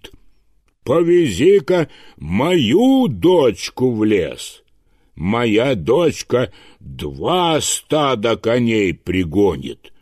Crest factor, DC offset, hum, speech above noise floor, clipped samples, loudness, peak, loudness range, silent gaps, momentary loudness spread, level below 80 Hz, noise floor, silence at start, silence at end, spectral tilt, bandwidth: 14 dB; under 0.1%; none; 41 dB; under 0.1%; -16 LUFS; -4 dBFS; 4 LU; none; 14 LU; -44 dBFS; -57 dBFS; 0.05 s; 0.3 s; -5 dB/octave; 15 kHz